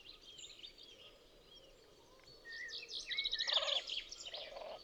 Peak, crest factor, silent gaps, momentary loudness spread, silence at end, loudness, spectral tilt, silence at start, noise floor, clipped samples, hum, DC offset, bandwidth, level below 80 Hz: -24 dBFS; 22 dB; none; 26 LU; 0 s; -39 LUFS; 0.5 dB/octave; 0 s; -64 dBFS; under 0.1%; none; under 0.1%; over 20 kHz; -70 dBFS